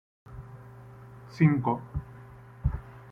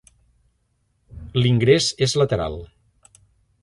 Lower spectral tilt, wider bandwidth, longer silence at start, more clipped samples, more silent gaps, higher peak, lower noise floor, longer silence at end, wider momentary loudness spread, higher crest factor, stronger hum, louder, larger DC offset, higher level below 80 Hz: first, -9.5 dB/octave vs -5 dB/octave; second, 6.4 kHz vs 11.5 kHz; second, 0.3 s vs 1.15 s; neither; neither; second, -10 dBFS vs -2 dBFS; second, -48 dBFS vs -68 dBFS; second, 0 s vs 0.95 s; first, 25 LU vs 16 LU; about the same, 22 dB vs 20 dB; neither; second, -29 LUFS vs -19 LUFS; neither; about the same, -44 dBFS vs -44 dBFS